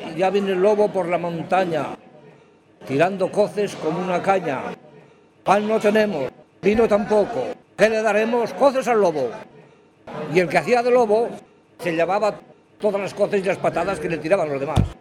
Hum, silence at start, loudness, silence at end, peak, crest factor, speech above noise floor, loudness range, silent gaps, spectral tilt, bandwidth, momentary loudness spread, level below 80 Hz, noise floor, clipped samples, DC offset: none; 0 s; -21 LUFS; 0.05 s; -2 dBFS; 20 dB; 32 dB; 4 LU; none; -6 dB/octave; 13 kHz; 11 LU; -46 dBFS; -52 dBFS; under 0.1%; under 0.1%